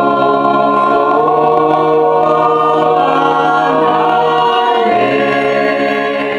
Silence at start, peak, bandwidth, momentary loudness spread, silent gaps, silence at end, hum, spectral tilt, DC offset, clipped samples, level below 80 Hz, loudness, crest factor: 0 s; 0 dBFS; 10.5 kHz; 2 LU; none; 0 s; none; -6 dB/octave; under 0.1%; under 0.1%; -52 dBFS; -11 LUFS; 10 dB